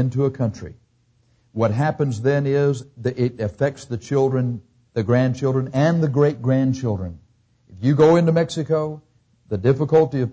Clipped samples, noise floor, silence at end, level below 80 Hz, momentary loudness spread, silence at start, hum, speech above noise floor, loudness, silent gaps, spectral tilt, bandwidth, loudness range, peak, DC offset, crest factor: under 0.1%; -61 dBFS; 0 s; -48 dBFS; 13 LU; 0 s; none; 42 dB; -20 LUFS; none; -8 dB/octave; 8 kHz; 3 LU; -6 dBFS; under 0.1%; 16 dB